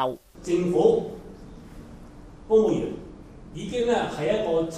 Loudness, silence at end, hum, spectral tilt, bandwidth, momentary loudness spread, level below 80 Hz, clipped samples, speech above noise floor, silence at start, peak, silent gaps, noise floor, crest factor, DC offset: -24 LUFS; 0 s; none; -6.5 dB/octave; 10.5 kHz; 24 LU; -48 dBFS; under 0.1%; 21 dB; 0 s; -8 dBFS; none; -44 dBFS; 18 dB; under 0.1%